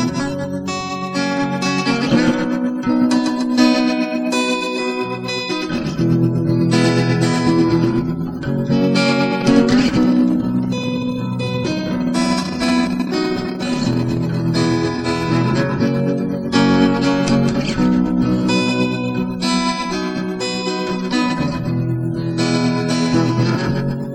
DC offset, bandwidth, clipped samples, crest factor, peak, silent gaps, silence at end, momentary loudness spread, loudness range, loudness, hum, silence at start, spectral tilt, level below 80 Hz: under 0.1%; 11.5 kHz; under 0.1%; 16 dB; -2 dBFS; none; 0 s; 7 LU; 3 LU; -18 LUFS; none; 0 s; -6 dB/octave; -42 dBFS